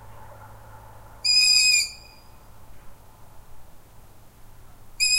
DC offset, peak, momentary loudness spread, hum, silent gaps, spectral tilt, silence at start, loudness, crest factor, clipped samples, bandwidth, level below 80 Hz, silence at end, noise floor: under 0.1%; -6 dBFS; 12 LU; none; none; 2.5 dB/octave; 0 s; -18 LUFS; 20 dB; under 0.1%; 16 kHz; -50 dBFS; 0 s; -47 dBFS